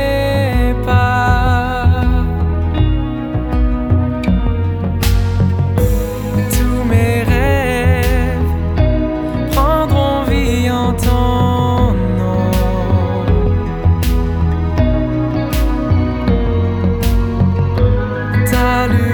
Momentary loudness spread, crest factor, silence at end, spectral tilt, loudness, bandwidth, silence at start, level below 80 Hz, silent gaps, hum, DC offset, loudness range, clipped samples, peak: 4 LU; 12 dB; 0 s; -7 dB/octave; -15 LUFS; over 20 kHz; 0 s; -18 dBFS; none; none; under 0.1%; 1 LU; under 0.1%; 0 dBFS